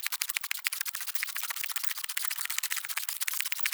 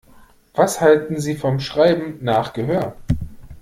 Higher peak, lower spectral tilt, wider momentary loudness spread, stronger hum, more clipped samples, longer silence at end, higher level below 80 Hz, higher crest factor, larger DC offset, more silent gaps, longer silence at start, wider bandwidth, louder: second, -6 dBFS vs -2 dBFS; second, 7.5 dB/octave vs -6 dB/octave; second, 2 LU vs 10 LU; neither; neither; about the same, 0 s vs 0 s; second, under -90 dBFS vs -40 dBFS; first, 28 dB vs 18 dB; neither; neither; second, 0 s vs 0.55 s; first, over 20 kHz vs 16 kHz; second, -31 LUFS vs -19 LUFS